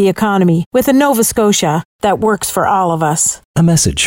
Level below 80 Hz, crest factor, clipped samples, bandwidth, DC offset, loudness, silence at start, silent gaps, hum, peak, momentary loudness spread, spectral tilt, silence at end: -38 dBFS; 10 dB; under 0.1%; 16.5 kHz; under 0.1%; -13 LUFS; 0 s; 0.66-0.71 s, 1.85-1.99 s, 3.45-3.54 s; none; -2 dBFS; 3 LU; -4.5 dB/octave; 0 s